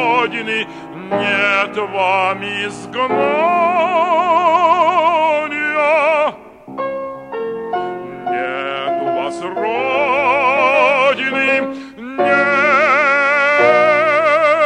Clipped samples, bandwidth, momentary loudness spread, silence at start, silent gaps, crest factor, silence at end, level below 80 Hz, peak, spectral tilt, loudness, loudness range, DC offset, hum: under 0.1%; 10 kHz; 12 LU; 0 s; none; 14 dB; 0 s; -58 dBFS; -2 dBFS; -4.5 dB/octave; -15 LUFS; 7 LU; under 0.1%; none